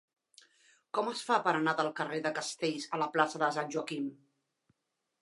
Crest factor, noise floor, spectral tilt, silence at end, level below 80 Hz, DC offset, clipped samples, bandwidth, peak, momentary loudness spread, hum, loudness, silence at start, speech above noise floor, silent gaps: 22 dB; -84 dBFS; -4 dB/octave; 1.05 s; -88 dBFS; under 0.1%; under 0.1%; 11.5 kHz; -12 dBFS; 8 LU; none; -33 LUFS; 0.95 s; 51 dB; none